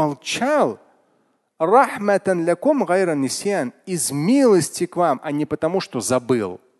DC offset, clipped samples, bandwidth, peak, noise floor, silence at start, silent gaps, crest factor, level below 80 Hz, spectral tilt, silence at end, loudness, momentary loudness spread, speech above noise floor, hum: under 0.1%; under 0.1%; 12.5 kHz; -2 dBFS; -65 dBFS; 0 s; none; 18 dB; -62 dBFS; -4.5 dB/octave; 0.25 s; -20 LUFS; 8 LU; 45 dB; none